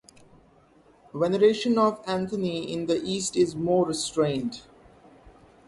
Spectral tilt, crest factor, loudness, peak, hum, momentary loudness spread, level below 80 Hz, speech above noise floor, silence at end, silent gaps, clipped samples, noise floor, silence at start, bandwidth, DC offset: -5 dB/octave; 18 dB; -25 LUFS; -10 dBFS; none; 9 LU; -60 dBFS; 33 dB; 0.4 s; none; under 0.1%; -58 dBFS; 1.15 s; 11.5 kHz; under 0.1%